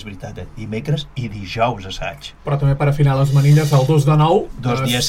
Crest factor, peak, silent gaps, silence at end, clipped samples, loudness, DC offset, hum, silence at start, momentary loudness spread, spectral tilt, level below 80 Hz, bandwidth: 12 dB; -4 dBFS; none; 0 s; under 0.1%; -17 LUFS; under 0.1%; none; 0 s; 16 LU; -6.5 dB/octave; -36 dBFS; 16 kHz